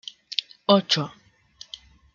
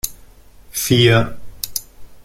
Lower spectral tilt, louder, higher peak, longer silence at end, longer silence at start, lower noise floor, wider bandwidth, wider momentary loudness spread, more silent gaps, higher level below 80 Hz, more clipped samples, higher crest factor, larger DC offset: about the same, -4.5 dB/octave vs -4.5 dB/octave; second, -23 LUFS vs -17 LUFS; about the same, -2 dBFS vs -2 dBFS; first, 1.05 s vs 0.05 s; first, 0.3 s vs 0.05 s; first, -50 dBFS vs -43 dBFS; second, 7.6 kHz vs 16.5 kHz; first, 22 LU vs 15 LU; neither; second, -64 dBFS vs -40 dBFS; neither; first, 26 dB vs 18 dB; neither